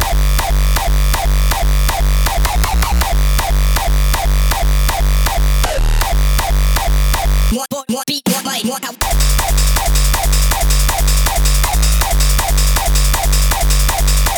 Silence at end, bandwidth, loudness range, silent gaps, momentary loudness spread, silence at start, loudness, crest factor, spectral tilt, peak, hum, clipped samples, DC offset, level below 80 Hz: 0 s; over 20 kHz; 2 LU; none; 3 LU; 0 s; -15 LUFS; 10 dB; -3.5 dB/octave; -2 dBFS; none; under 0.1%; under 0.1%; -14 dBFS